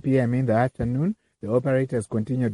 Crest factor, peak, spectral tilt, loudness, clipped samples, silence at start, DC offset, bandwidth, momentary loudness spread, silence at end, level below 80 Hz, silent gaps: 16 dB; -8 dBFS; -8.5 dB/octave; -24 LUFS; under 0.1%; 0.05 s; under 0.1%; 11 kHz; 5 LU; 0 s; -50 dBFS; none